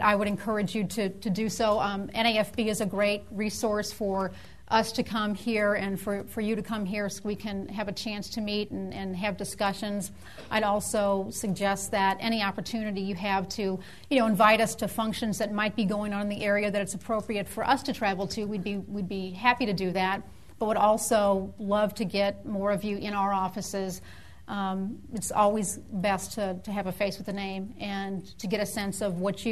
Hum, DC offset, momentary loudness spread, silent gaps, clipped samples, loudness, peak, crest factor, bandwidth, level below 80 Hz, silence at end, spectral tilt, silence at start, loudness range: none; 0.4%; 9 LU; none; under 0.1%; -29 LUFS; -6 dBFS; 22 dB; 13.5 kHz; -56 dBFS; 0 s; -4.5 dB/octave; 0 s; 5 LU